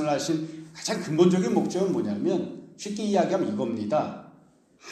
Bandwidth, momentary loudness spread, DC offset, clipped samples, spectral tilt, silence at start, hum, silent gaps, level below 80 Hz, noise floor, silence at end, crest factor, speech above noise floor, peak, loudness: 12.5 kHz; 14 LU; under 0.1%; under 0.1%; -6 dB/octave; 0 s; none; none; -70 dBFS; -57 dBFS; 0 s; 20 dB; 32 dB; -6 dBFS; -26 LUFS